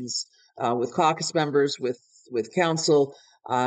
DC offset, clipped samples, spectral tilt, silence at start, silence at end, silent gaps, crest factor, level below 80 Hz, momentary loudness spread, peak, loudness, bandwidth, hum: under 0.1%; under 0.1%; -4 dB/octave; 0 s; 0 s; none; 18 dB; -76 dBFS; 10 LU; -8 dBFS; -25 LUFS; 9.4 kHz; none